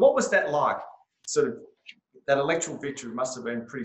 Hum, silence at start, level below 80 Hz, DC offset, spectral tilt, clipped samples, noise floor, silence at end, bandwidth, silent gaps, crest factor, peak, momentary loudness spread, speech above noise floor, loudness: none; 0 s; -68 dBFS; under 0.1%; -3.5 dB/octave; under 0.1%; -53 dBFS; 0 s; 8.6 kHz; none; 18 dB; -8 dBFS; 15 LU; 26 dB; -27 LUFS